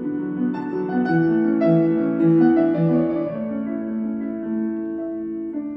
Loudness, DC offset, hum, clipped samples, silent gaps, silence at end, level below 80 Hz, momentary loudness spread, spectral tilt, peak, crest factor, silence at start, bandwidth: -21 LUFS; under 0.1%; none; under 0.1%; none; 0 s; -58 dBFS; 11 LU; -11.5 dB/octave; -6 dBFS; 14 dB; 0 s; 4.8 kHz